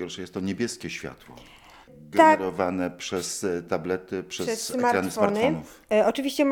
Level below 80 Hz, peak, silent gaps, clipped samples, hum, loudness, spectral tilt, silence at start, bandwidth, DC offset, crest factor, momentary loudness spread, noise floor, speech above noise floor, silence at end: -62 dBFS; -4 dBFS; none; under 0.1%; none; -25 LUFS; -4.5 dB/octave; 0 s; 19 kHz; under 0.1%; 22 dB; 15 LU; -48 dBFS; 23 dB; 0 s